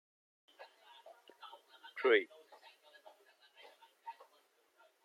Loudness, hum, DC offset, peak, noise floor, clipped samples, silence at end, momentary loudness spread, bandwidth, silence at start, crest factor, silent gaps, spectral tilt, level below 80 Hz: -33 LUFS; none; under 0.1%; -16 dBFS; -73 dBFS; under 0.1%; 0.95 s; 29 LU; 13.5 kHz; 0.6 s; 28 dB; none; -3 dB/octave; under -90 dBFS